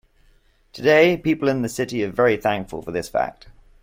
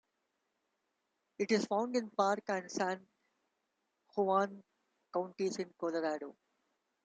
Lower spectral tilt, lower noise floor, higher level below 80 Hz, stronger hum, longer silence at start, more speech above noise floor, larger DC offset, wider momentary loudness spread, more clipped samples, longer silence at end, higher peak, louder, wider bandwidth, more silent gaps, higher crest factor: about the same, -5.5 dB/octave vs -4.5 dB/octave; second, -57 dBFS vs -84 dBFS; first, -50 dBFS vs -86 dBFS; neither; second, 0.75 s vs 1.4 s; second, 37 dB vs 49 dB; neither; first, 12 LU vs 9 LU; neither; second, 0.5 s vs 0.75 s; first, -4 dBFS vs -16 dBFS; first, -20 LUFS vs -36 LUFS; first, 16.5 kHz vs 9.4 kHz; neither; about the same, 18 dB vs 22 dB